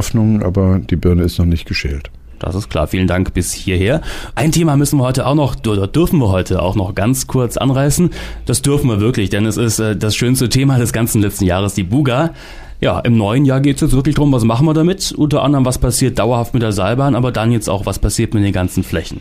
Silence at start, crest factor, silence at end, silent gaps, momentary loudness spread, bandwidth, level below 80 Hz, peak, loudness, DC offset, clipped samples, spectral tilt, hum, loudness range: 0 s; 10 dB; 0 s; none; 6 LU; 15.5 kHz; -28 dBFS; -4 dBFS; -15 LUFS; under 0.1%; under 0.1%; -6 dB/octave; none; 3 LU